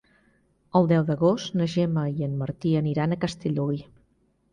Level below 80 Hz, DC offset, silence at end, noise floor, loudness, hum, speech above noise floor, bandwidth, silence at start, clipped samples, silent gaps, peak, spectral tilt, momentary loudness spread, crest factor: -56 dBFS; under 0.1%; 0.7 s; -66 dBFS; -25 LUFS; none; 42 dB; 9.8 kHz; 0.75 s; under 0.1%; none; -6 dBFS; -7.5 dB/octave; 7 LU; 18 dB